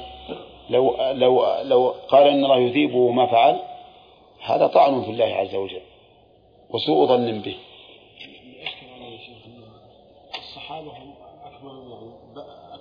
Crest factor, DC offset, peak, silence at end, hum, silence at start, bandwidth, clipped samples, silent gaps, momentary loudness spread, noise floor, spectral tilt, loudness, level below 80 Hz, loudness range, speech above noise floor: 20 dB; under 0.1%; -2 dBFS; 0.05 s; none; 0 s; 5.2 kHz; under 0.1%; none; 25 LU; -54 dBFS; -7.5 dB/octave; -19 LUFS; -60 dBFS; 21 LU; 35 dB